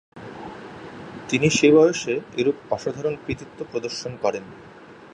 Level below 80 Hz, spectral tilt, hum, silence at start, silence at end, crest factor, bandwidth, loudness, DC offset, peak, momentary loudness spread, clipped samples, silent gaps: -54 dBFS; -4.5 dB/octave; none; 0.15 s; 0.1 s; 18 dB; 10.5 kHz; -22 LUFS; under 0.1%; -4 dBFS; 23 LU; under 0.1%; none